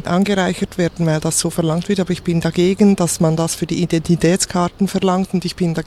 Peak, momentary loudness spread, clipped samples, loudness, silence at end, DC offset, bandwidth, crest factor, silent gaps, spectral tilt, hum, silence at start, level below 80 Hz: -2 dBFS; 6 LU; under 0.1%; -17 LUFS; 0 s; under 0.1%; 14 kHz; 16 dB; none; -5.5 dB/octave; none; 0 s; -42 dBFS